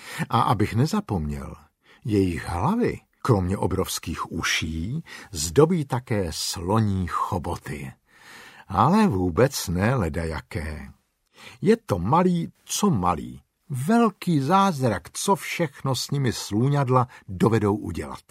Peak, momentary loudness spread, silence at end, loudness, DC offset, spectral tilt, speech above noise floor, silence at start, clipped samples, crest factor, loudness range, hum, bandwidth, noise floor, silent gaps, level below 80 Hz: -4 dBFS; 12 LU; 0.1 s; -24 LUFS; under 0.1%; -5.5 dB/octave; 24 dB; 0 s; under 0.1%; 20 dB; 3 LU; none; 16 kHz; -48 dBFS; none; -44 dBFS